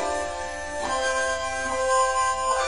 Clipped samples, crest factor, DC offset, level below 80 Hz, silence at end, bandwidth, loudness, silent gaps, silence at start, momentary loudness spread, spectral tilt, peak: under 0.1%; 14 dB; 0.6%; -46 dBFS; 0 s; 11 kHz; -25 LUFS; none; 0 s; 9 LU; -1.5 dB/octave; -12 dBFS